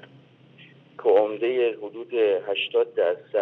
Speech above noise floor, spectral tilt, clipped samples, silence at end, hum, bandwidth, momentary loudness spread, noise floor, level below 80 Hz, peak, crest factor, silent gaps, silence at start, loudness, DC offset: 30 dB; -6.5 dB/octave; under 0.1%; 0 s; none; 4.1 kHz; 6 LU; -53 dBFS; -88 dBFS; -8 dBFS; 18 dB; none; 0.6 s; -24 LUFS; under 0.1%